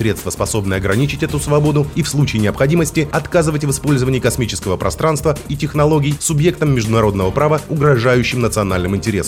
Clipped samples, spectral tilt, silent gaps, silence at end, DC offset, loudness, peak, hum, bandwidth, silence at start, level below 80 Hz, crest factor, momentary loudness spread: under 0.1%; -5.5 dB/octave; none; 0 s; under 0.1%; -16 LUFS; -2 dBFS; none; 16.5 kHz; 0 s; -34 dBFS; 14 dB; 5 LU